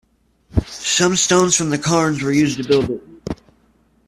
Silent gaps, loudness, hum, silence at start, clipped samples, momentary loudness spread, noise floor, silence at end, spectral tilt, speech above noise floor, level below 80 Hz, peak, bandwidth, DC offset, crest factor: none; -17 LUFS; none; 0.55 s; under 0.1%; 16 LU; -57 dBFS; 0.75 s; -3.5 dB/octave; 41 dB; -40 dBFS; -2 dBFS; 14 kHz; under 0.1%; 18 dB